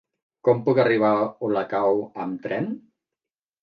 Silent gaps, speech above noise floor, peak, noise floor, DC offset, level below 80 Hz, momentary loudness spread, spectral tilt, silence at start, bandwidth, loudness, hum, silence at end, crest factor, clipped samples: none; 67 dB; -6 dBFS; -89 dBFS; under 0.1%; -70 dBFS; 12 LU; -9 dB/octave; 0.45 s; 5.4 kHz; -23 LUFS; none; 0.85 s; 18 dB; under 0.1%